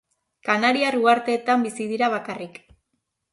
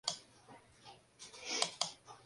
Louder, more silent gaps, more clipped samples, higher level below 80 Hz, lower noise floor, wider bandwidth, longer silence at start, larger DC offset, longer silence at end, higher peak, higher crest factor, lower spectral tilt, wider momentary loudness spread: first, -21 LUFS vs -39 LUFS; neither; neither; first, -68 dBFS vs -80 dBFS; first, -76 dBFS vs -61 dBFS; about the same, 11.5 kHz vs 11.5 kHz; first, 0.45 s vs 0.05 s; neither; first, 0.85 s vs 0 s; first, -6 dBFS vs -14 dBFS; second, 18 dB vs 30 dB; first, -4 dB/octave vs 0 dB/octave; second, 14 LU vs 23 LU